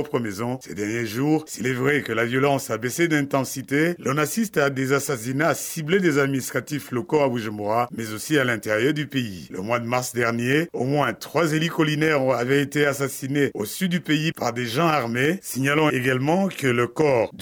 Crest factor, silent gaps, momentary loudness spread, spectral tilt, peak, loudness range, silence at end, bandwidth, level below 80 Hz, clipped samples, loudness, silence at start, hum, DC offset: 16 dB; none; 6 LU; -5 dB/octave; -6 dBFS; 2 LU; 0 s; over 20 kHz; -62 dBFS; under 0.1%; -23 LUFS; 0 s; none; under 0.1%